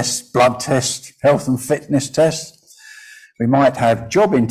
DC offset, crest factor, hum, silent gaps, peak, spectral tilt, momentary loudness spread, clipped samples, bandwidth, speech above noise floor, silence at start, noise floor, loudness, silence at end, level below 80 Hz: under 0.1%; 14 dB; none; none; -4 dBFS; -5 dB/octave; 6 LU; under 0.1%; 16 kHz; 26 dB; 0 s; -42 dBFS; -17 LUFS; 0 s; -50 dBFS